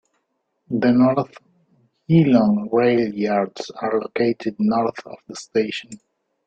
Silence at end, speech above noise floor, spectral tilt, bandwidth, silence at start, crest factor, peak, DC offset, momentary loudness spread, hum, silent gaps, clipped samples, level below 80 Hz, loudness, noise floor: 0.5 s; 53 dB; -7.5 dB/octave; 9 kHz; 0.7 s; 18 dB; -4 dBFS; under 0.1%; 13 LU; none; none; under 0.1%; -60 dBFS; -20 LUFS; -73 dBFS